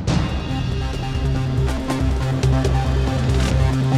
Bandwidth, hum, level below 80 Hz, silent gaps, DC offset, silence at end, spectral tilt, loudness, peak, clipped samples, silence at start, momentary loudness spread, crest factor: 12.5 kHz; none; -24 dBFS; none; under 0.1%; 0 s; -6.5 dB/octave; -21 LUFS; -6 dBFS; under 0.1%; 0 s; 5 LU; 12 dB